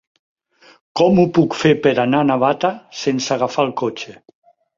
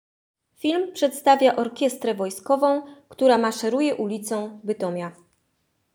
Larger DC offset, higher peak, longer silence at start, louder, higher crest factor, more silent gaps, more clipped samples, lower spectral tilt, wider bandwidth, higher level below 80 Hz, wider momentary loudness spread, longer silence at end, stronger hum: neither; first, 0 dBFS vs -4 dBFS; first, 0.95 s vs 0.65 s; first, -17 LUFS vs -23 LUFS; about the same, 18 dB vs 18 dB; neither; neither; first, -6 dB/octave vs -4.5 dB/octave; second, 7.6 kHz vs over 20 kHz; first, -56 dBFS vs -76 dBFS; about the same, 10 LU vs 10 LU; second, 0.65 s vs 0.85 s; neither